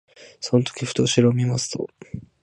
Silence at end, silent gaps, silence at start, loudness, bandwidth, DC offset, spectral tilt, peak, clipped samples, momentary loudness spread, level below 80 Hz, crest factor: 0.2 s; none; 0.2 s; -22 LUFS; 11.5 kHz; under 0.1%; -5.5 dB/octave; -4 dBFS; under 0.1%; 16 LU; -56 dBFS; 18 dB